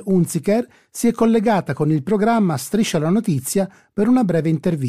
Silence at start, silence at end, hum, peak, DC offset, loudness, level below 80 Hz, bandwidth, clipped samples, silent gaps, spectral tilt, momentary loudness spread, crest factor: 0 s; 0 s; none; -6 dBFS; 0.2%; -19 LUFS; -52 dBFS; 15.5 kHz; under 0.1%; none; -6.5 dB/octave; 5 LU; 12 dB